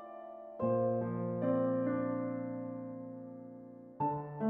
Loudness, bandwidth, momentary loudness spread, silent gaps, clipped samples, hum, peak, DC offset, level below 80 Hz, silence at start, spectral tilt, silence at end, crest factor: -36 LUFS; 3.2 kHz; 16 LU; none; under 0.1%; none; -22 dBFS; under 0.1%; -72 dBFS; 0 s; -10 dB/octave; 0 s; 14 dB